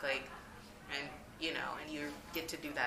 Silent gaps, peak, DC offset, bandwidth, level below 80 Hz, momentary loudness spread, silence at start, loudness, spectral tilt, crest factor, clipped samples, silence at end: none; -18 dBFS; under 0.1%; 15.5 kHz; -64 dBFS; 13 LU; 0 s; -42 LUFS; -3 dB/octave; 22 dB; under 0.1%; 0 s